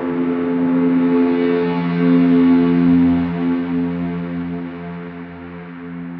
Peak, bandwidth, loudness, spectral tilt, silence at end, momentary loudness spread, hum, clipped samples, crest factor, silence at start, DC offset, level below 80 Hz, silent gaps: -4 dBFS; 4.7 kHz; -16 LUFS; -11 dB/octave; 0 s; 18 LU; none; under 0.1%; 12 dB; 0 s; under 0.1%; -48 dBFS; none